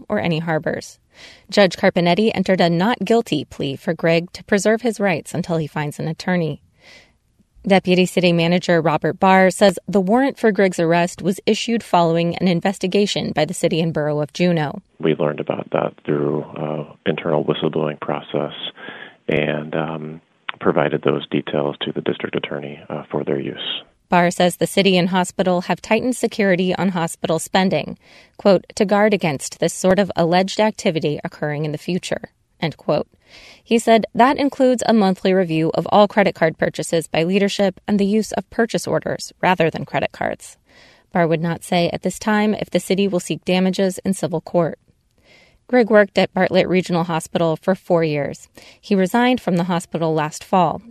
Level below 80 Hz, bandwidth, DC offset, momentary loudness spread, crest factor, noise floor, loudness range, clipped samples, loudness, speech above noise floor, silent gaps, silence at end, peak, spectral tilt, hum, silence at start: -56 dBFS; 13.5 kHz; under 0.1%; 10 LU; 18 dB; -59 dBFS; 6 LU; under 0.1%; -19 LUFS; 41 dB; none; 0 s; 0 dBFS; -5.5 dB/octave; none; 0 s